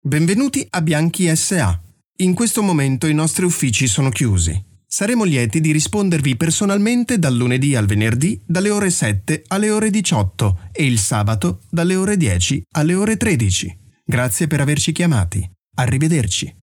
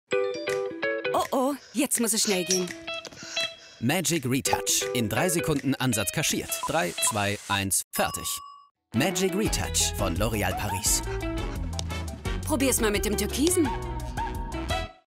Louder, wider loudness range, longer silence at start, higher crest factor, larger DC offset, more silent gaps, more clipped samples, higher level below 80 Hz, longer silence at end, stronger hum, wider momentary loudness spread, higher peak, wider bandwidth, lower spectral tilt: first, -17 LUFS vs -26 LUFS; about the same, 1 LU vs 2 LU; about the same, 0.05 s vs 0.1 s; second, 12 dB vs 22 dB; neither; about the same, 15.59-15.71 s vs 7.84-7.91 s, 8.71-8.75 s; neither; about the same, -40 dBFS vs -40 dBFS; about the same, 0.1 s vs 0.15 s; neither; second, 5 LU vs 9 LU; about the same, -4 dBFS vs -6 dBFS; first, 19 kHz vs 16 kHz; first, -5 dB/octave vs -3.5 dB/octave